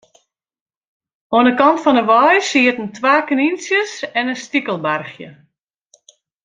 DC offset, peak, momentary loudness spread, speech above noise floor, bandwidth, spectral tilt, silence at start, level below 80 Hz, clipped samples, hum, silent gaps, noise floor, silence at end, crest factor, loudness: under 0.1%; -2 dBFS; 9 LU; 46 dB; 9.4 kHz; -4 dB/octave; 1.3 s; -64 dBFS; under 0.1%; none; none; -62 dBFS; 1.15 s; 16 dB; -15 LUFS